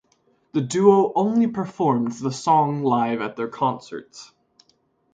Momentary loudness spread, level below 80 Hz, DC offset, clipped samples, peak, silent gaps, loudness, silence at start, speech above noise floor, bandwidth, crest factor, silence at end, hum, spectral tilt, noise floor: 12 LU; -66 dBFS; under 0.1%; under 0.1%; -2 dBFS; none; -21 LUFS; 0.55 s; 44 dB; 9.2 kHz; 20 dB; 0.9 s; none; -6.5 dB/octave; -65 dBFS